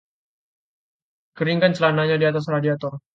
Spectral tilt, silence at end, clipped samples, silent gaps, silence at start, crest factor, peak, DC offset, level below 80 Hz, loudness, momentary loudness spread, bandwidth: -7 dB/octave; 0.15 s; under 0.1%; none; 1.35 s; 18 dB; -4 dBFS; under 0.1%; -66 dBFS; -20 LUFS; 7 LU; 7.6 kHz